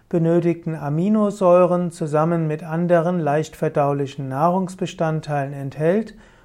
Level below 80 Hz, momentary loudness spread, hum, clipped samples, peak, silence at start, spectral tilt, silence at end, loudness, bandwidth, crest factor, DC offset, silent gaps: -56 dBFS; 9 LU; none; under 0.1%; -4 dBFS; 0.1 s; -8 dB/octave; 0.3 s; -20 LUFS; 12.5 kHz; 16 dB; under 0.1%; none